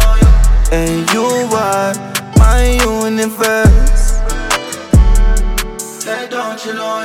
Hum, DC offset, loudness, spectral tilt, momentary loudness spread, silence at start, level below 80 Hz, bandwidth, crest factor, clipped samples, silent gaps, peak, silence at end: none; under 0.1%; -14 LUFS; -5 dB/octave; 10 LU; 0 s; -12 dBFS; 16 kHz; 10 dB; under 0.1%; none; 0 dBFS; 0 s